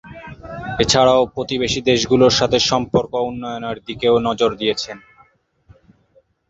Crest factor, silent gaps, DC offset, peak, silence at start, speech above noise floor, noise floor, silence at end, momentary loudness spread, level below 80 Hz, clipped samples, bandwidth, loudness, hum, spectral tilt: 18 dB; none; under 0.1%; -2 dBFS; 0.05 s; 40 dB; -58 dBFS; 1.5 s; 17 LU; -44 dBFS; under 0.1%; 8.2 kHz; -17 LUFS; none; -4 dB/octave